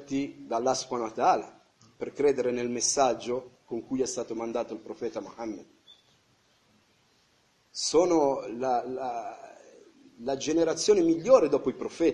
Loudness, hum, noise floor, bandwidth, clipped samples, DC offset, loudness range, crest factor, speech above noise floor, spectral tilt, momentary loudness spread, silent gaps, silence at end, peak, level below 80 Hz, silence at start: -28 LUFS; none; -67 dBFS; 11.5 kHz; under 0.1%; under 0.1%; 10 LU; 22 dB; 40 dB; -3.5 dB/octave; 16 LU; none; 0 s; -6 dBFS; -64 dBFS; 0 s